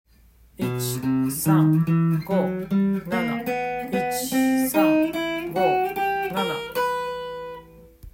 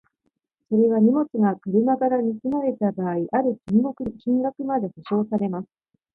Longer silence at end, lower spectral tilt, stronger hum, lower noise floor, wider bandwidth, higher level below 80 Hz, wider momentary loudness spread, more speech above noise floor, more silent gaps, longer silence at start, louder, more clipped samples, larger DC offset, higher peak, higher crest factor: second, 0.05 s vs 0.5 s; second, -6 dB/octave vs -11 dB/octave; neither; second, -54 dBFS vs -75 dBFS; first, 16.5 kHz vs 4.4 kHz; first, -54 dBFS vs -62 dBFS; about the same, 9 LU vs 7 LU; second, 33 dB vs 53 dB; neither; about the same, 0.6 s vs 0.7 s; about the same, -23 LUFS vs -23 LUFS; neither; neither; about the same, -6 dBFS vs -8 dBFS; about the same, 16 dB vs 14 dB